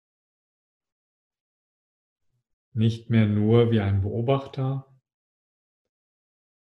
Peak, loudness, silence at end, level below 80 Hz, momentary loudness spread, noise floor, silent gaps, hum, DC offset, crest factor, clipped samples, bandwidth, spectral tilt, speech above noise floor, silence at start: -6 dBFS; -23 LUFS; 1.8 s; -62 dBFS; 10 LU; under -90 dBFS; none; none; under 0.1%; 22 dB; under 0.1%; 6.2 kHz; -9 dB/octave; over 68 dB; 2.75 s